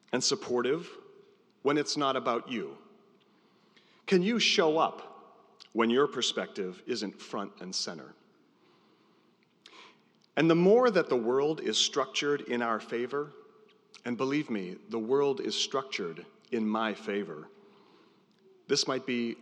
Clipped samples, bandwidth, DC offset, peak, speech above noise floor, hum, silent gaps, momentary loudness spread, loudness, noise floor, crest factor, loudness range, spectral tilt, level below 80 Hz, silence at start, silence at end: under 0.1%; 10.5 kHz; under 0.1%; -12 dBFS; 37 dB; none; none; 14 LU; -30 LUFS; -67 dBFS; 20 dB; 8 LU; -4 dB/octave; under -90 dBFS; 0.15 s; 0.05 s